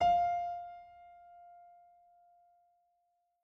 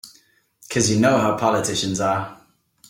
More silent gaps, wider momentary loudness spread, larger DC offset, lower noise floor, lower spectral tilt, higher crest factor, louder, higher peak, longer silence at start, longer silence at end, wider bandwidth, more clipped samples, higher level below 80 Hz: neither; first, 26 LU vs 9 LU; neither; first, -79 dBFS vs -58 dBFS; about the same, -4.5 dB/octave vs -4 dB/octave; about the same, 18 dB vs 18 dB; second, -34 LUFS vs -20 LUFS; second, -20 dBFS vs -4 dBFS; about the same, 0 s vs 0.05 s; first, 1.95 s vs 0.55 s; second, 6.2 kHz vs 17 kHz; neither; second, -66 dBFS vs -54 dBFS